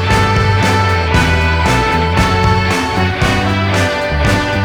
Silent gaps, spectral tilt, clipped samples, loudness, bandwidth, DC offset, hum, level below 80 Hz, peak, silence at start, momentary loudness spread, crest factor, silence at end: none; -5.5 dB/octave; under 0.1%; -13 LUFS; 18.5 kHz; under 0.1%; none; -22 dBFS; 0 dBFS; 0 s; 2 LU; 12 dB; 0 s